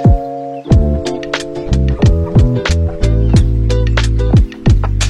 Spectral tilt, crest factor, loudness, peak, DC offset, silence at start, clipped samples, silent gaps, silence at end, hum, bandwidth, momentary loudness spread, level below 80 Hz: -6.5 dB/octave; 12 dB; -14 LUFS; 0 dBFS; under 0.1%; 0 s; under 0.1%; none; 0 s; none; 10.5 kHz; 7 LU; -16 dBFS